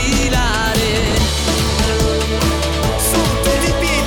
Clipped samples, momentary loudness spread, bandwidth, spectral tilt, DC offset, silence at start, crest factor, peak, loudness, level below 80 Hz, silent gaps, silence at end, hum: under 0.1%; 2 LU; 20 kHz; -4 dB/octave; under 0.1%; 0 s; 12 dB; -4 dBFS; -16 LUFS; -20 dBFS; none; 0 s; none